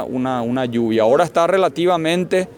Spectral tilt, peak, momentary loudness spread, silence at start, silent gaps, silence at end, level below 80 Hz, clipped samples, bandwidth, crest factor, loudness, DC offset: -6 dB/octave; -4 dBFS; 5 LU; 0 s; none; 0.05 s; -58 dBFS; under 0.1%; 17.5 kHz; 14 dB; -17 LUFS; under 0.1%